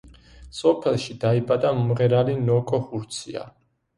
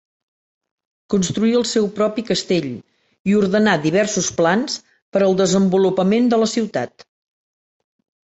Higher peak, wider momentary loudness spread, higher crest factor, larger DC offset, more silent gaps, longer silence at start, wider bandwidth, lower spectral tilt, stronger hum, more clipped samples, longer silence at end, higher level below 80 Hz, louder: second, -6 dBFS vs -2 dBFS; about the same, 12 LU vs 10 LU; about the same, 18 dB vs 16 dB; neither; second, none vs 3.19-3.25 s, 5.02-5.12 s; second, 0.05 s vs 1.1 s; first, 11.5 kHz vs 8.2 kHz; first, -7 dB/octave vs -5 dB/octave; neither; neither; second, 0.5 s vs 1.4 s; about the same, -54 dBFS vs -56 dBFS; second, -23 LUFS vs -18 LUFS